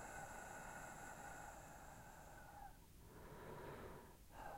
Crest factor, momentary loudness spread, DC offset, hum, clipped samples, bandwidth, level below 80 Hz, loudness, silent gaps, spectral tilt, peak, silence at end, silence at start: 14 dB; 8 LU; under 0.1%; none; under 0.1%; 16 kHz; -66 dBFS; -57 LUFS; none; -4 dB/octave; -42 dBFS; 0 s; 0 s